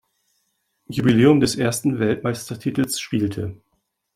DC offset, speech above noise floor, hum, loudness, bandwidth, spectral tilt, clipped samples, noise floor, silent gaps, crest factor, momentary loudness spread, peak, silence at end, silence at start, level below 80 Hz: under 0.1%; 52 dB; none; -20 LUFS; 15.5 kHz; -5.5 dB/octave; under 0.1%; -72 dBFS; none; 18 dB; 12 LU; -2 dBFS; 0.6 s; 0.9 s; -52 dBFS